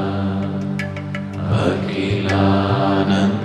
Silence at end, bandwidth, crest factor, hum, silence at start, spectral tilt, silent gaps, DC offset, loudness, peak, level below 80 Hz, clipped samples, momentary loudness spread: 0 s; 10 kHz; 14 dB; 50 Hz at -35 dBFS; 0 s; -7.5 dB/octave; none; under 0.1%; -19 LUFS; -4 dBFS; -48 dBFS; under 0.1%; 9 LU